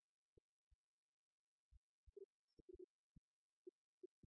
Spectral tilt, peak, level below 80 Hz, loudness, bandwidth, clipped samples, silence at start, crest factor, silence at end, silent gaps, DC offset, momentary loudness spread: 3.5 dB/octave; -50 dBFS; -82 dBFS; -67 LUFS; 0.8 kHz; under 0.1%; 0.7 s; 20 dB; 0.2 s; 0.74-1.71 s, 1.77-2.07 s, 2.25-2.68 s, 2.84-4.01 s; under 0.1%; 4 LU